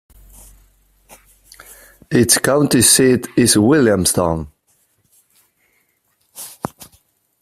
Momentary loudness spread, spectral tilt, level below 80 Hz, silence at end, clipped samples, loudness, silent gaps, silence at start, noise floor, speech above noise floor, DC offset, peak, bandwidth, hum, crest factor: 20 LU; -3.5 dB/octave; -46 dBFS; 0.55 s; under 0.1%; -13 LUFS; none; 2.1 s; -64 dBFS; 51 dB; under 0.1%; 0 dBFS; 16 kHz; none; 18 dB